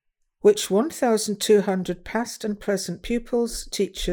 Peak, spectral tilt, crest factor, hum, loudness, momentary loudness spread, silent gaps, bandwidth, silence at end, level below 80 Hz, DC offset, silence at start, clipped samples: -6 dBFS; -4.5 dB/octave; 18 dB; none; -23 LUFS; 8 LU; none; over 20 kHz; 0 s; -44 dBFS; under 0.1%; 0.45 s; under 0.1%